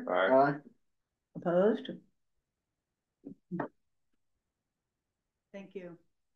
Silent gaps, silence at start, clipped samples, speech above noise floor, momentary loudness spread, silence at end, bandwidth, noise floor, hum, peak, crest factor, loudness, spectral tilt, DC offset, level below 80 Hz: none; 0 s; under 0.1%; 57 dB; 24 LU; 0.4 s; 6.2 kHz; -88 dBFS; none; -14 dBFS; 22 dB; -30 LUFS; -8.5 dB/octave; under 0.1%; -84 dBFS